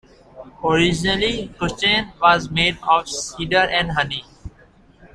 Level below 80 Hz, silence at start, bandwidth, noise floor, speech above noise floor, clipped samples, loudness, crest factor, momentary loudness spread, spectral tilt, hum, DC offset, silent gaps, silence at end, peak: -42 dBFS; 0.35 s; 12.5 kHz; -51 dBFS; 31 dB; under 0.1%; -19 LUFS; 20 dB; 10 LU; -3.5 dB/octave; none; under 0.1%; none; 0.1 s; -2 dBFS